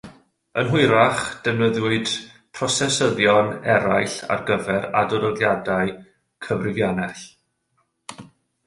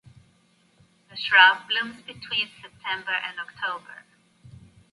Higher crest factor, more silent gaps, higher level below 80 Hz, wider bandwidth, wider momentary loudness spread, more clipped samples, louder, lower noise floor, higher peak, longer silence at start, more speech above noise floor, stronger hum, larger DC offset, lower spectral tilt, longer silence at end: about the same, 20 dB vs 24 dB; neither; first, -54 dBFS vs -68 dBFS; about the same, 11.5 kHz vs 11.5 kHz; second, 14 LU vs 21 LU; neither; about the same, -21 LUFS vs -22 LUFS; first, -70 dBFS vs -63 dBFS; about the same, -2 dBFS vs -2 dBFS; second, 0.05 s vs 1.15 s; first, 49 dB vs 38 dB; neither; neither; first, -4.5 dB/octave vs -2 dB/octave; second, 0.4 s vs 1 s